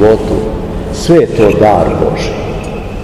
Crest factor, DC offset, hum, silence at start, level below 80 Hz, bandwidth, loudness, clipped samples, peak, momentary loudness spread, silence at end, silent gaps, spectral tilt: 10 dB; 0.7%; none; 0 s; -24 dBFS; 13 kHz; -11 LUFS; 2%; 0 dBFS; 12 LU; 0 s; none; -6.5 dB/octave